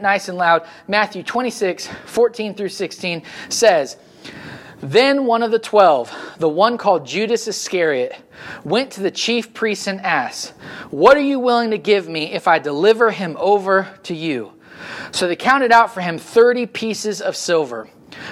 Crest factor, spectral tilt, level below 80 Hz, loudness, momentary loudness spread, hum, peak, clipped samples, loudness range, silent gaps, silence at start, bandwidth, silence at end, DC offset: 18 dB; -3.5 dB/octave; -60 dBFS; -17 LUFS; 17 LU; none; 0 dBFS; under 0.1%; 4 LU; none; 0 s; 14 kHz; 0 s; under 0.1%